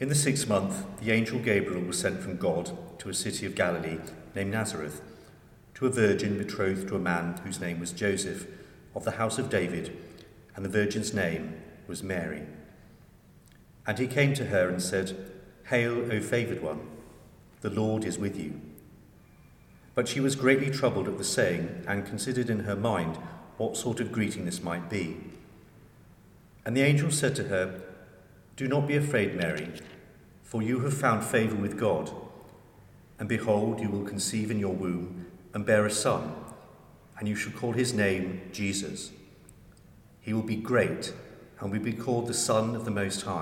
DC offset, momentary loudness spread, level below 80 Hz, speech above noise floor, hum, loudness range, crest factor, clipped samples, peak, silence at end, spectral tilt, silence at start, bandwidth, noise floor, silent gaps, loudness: under 0.1%; 15 LU; -60 dBFS; 27 dB; none; 4 LU; 22 dB; under 0.1%; -8 dBFS; 0 s; -5 dB/octave; 0 s; 17 kHz; -56 dBFS; none; -29 LUFS